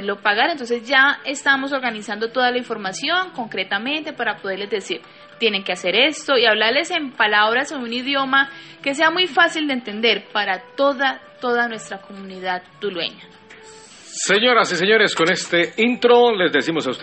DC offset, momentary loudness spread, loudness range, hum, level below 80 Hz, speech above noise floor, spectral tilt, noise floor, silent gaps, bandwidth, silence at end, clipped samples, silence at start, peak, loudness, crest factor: under 0.1%; 11 LU; 6 LU; none; -68 dBFS; 23 dB; -2.5 dB/octave; -43 dBFS; none; 8.8 kHz; 0 s; under 0.1%; 0 s; -2 dBFS; -18 LUFS; 18 dB